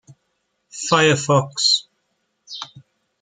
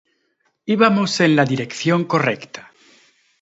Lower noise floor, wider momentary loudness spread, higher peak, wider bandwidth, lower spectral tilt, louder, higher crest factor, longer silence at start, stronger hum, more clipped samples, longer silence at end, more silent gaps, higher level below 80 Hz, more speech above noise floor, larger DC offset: first, -71 dBFS vs -67 dBFS; first, 21 LU vs 17 LU; about the same, -2 dBFS vs 0 dBFS; first, 9.6 kHz vs 8 kHz; second, -3.5 dB/octave vs -5.5 dB/octave; about the same, -17 LUFS vs -18 LUFS; about the same, 20 dB vs 20 dB; about the same, 0.75 s vs 0.65 s; neither; neither; second, 0.4 s vs 0.8 s; neither; about the same, -66 dBFS vs -64 dBFS; first, 54 dB vs 50 dB; neither